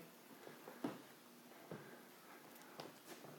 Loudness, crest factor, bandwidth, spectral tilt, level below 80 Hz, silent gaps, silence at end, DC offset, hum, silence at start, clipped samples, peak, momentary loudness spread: -56 LUFS; 26 dB; 18 kHz; -4.5 dB/octave; under -90 dBFS; none; 0 s; under 0.1%; none; 0 s; under 0.1%; -30 dBFS; 10 LU